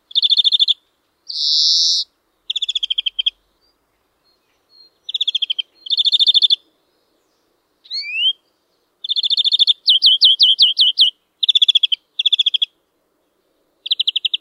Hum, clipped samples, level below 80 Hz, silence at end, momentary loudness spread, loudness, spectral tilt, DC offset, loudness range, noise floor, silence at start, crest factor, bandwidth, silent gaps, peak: none; under 0.1%; -74 dBFS; 0.05 s; 13 LU; -13 LUFS; 6 dB/octave; under 0.1%; 10 LU; -66 dBFS; 0.15 s; 16 dB; 13.5 kHz; none; -2 dBFS